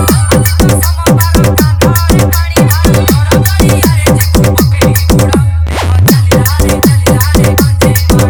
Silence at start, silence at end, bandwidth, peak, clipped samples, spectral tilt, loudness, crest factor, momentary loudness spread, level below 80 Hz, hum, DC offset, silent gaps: 0 s; 0 s; over 20 kHz; 0 dBFS; 1%; -5.5 dB/octave; -8 LUFS; 6 dB; 1 LU; -18 dBFS; none; under 0.1%; none